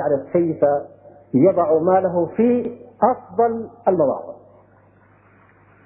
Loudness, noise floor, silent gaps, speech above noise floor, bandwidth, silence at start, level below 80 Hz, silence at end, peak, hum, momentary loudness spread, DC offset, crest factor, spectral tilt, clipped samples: -19 LUFS; -53 dBFS; none; 35 dB; 3.1 kHz; 0 s; -62 dBFS; 1.5 s; -4 dBFS; 50 Hz at -50 dBFS; 9 LU; under 0.1%; 16 dB; -13.5 dB/octave; under 0.1%